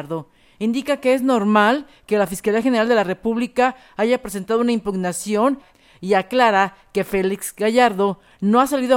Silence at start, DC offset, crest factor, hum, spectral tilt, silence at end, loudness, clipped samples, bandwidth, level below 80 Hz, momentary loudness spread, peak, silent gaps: 0 s; under 0.1%; 16 dB; none; -5 dB/octave; 0 s; -19 LUFS; under 0.1%; 17 kHz; -54 dBFS; 8 LU; -2 dBFS; none